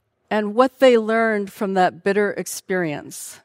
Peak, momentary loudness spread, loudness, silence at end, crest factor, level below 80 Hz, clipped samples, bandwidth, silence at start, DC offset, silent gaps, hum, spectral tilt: -2 dBFS; 11 LU; -20 LUFS; 0.1 s; 18 dB; -72 dBFS; under 0.1%; 16 kHz; 0.3 s; under 0.1%; none; none; -4.5 dB/octave